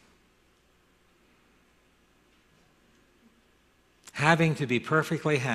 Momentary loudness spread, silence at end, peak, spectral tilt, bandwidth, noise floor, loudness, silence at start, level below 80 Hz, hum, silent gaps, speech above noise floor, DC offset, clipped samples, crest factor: 6 LU; 0 s; -6 dBFS; -6 dB/octave; 14 kHz; -65 dBFS; -26 LUFS; 4.15 s; -66 dBFS; none; none; 39 dB; under 0.1%; under 0.1%; 26 dB